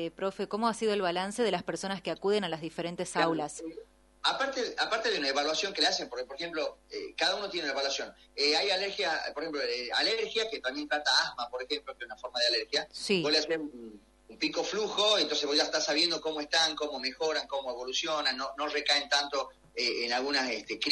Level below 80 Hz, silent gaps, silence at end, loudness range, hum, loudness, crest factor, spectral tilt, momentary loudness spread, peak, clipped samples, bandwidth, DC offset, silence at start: -66 dBFS; none; 0 s; 3 LU; none; -30 LUFS; 20 dB; -2 dB/octave; 10 LU; -12 dBFS; under 0.1%; 11.5 kHz; under 0.1%; 0 s